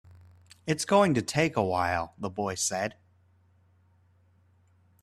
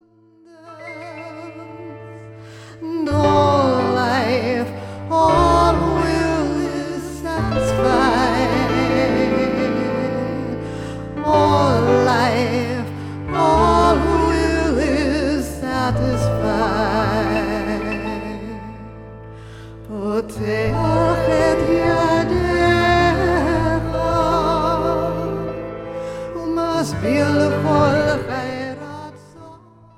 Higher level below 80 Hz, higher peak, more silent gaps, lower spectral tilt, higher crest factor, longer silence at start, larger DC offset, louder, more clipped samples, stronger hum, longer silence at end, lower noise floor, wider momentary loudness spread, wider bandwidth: second, -62 dBFS vs -34 dBFS; second, -10 dBFS vs -4 dBFS; neither; second, -4.5 dB/octave vs -6.5 dB/octave; first, 22 dB vs 16 dB; about the same, 0.65 s vs 0.65 s; neither; second, -28 LUFS vs -18 LUFS; neither; neither; first, 2.1 s vs 0.4 s; first, -64 dBFS vs -51 dBFS; second, 11 LU vs 18 LU; about the same, 14.5 kHz vs 15.5 kHz